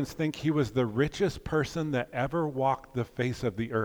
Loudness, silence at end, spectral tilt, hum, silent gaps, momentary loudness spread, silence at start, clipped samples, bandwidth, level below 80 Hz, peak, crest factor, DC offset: -30 LUFS; 0 s; -6.5 dB/octave; none; none; 4 LU; 0 s; under 0.1%; over 20 kHz; -52 dBFS; -14 dBFS; 16 dB; under 0.1%